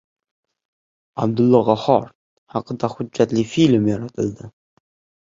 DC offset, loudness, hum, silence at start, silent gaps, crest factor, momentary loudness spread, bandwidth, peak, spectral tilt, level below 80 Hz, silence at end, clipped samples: under 0.1%; -19 LUFS; none; 1.15 s; 2.15-2.47 s; 18 dB; 14 LU; 7.6 kHz; -2 dBFS; -7 dB/octave; -56 dBFS; 0.85 s; under 0.1%